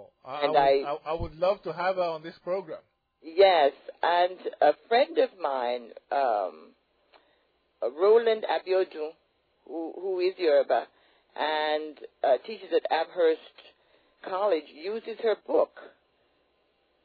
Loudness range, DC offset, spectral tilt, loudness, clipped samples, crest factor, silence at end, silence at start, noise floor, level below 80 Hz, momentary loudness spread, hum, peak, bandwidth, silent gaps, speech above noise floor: 4 LU; under 0.1%; -7 dB/octave; -27 LUFS; under 0.1%; 18 dB; 1.2 s; 0 s; -70 dBFS; -60 dBFS; 14 LU; none; -10 dBFS; 5 kHz; none; 44 dB